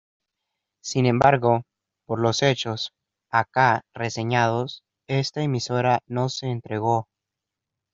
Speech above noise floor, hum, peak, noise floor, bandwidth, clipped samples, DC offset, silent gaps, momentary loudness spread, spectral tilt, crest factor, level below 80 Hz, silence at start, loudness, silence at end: 63 dB; none; -2 dBFS; -85 dBFS; 7.8 kHz; under 0.1%; under 0.1%; none; 11 LU; -5.5 dB/octave; 22 dB; -60 dBFS; 0.85 s; -23 LUFS; 0.9 s